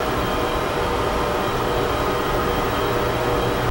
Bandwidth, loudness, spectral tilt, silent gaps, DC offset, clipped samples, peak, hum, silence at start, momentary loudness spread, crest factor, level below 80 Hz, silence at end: 16.5 kHz; -21 LUFS; -5 dB/octave; none; 0.2%; under 0.1%; -8 dBFS; none; 0 s; 1 LU; 12 dB; -32 dBFS; 0 s